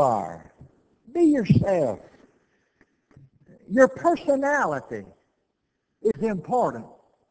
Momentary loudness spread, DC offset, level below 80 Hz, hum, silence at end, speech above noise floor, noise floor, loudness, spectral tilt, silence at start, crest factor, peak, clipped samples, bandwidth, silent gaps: 18 LU; under 0.1%; -54 dBFS; none; 0.45 s; 54 dB; -76 dBFS; -23 LUFS; -7.5 dB/octave; 0 s; 22 dB; -4 dBFS; under 0.1%; 8 kHz; none